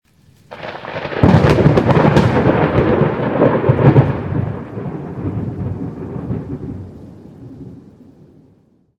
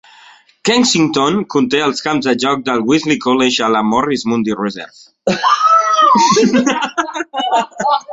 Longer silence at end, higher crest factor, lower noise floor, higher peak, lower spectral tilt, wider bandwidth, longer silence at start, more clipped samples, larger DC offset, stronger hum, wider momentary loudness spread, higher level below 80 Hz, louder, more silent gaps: first, 1.2 s vs 0 s; about the same, 16 dB vs 14 dB; first, -53 dBFS vs -44 dBFS; about the same, 0 dBFS vs 0 dBFS; first, -8.5 dB/octave vs -3.5 dB/octave; about the same, 8.8 kHz vs 8 kHz; second, 0.5 s vs 0.65 s; first, 0.2% vs under 0.1%; neither; neither; first, 20 LU vs 10 LU; first, -34 dBFS vs -54 dBFS; about the same, -15 LUFS vs -14 LUFS; neither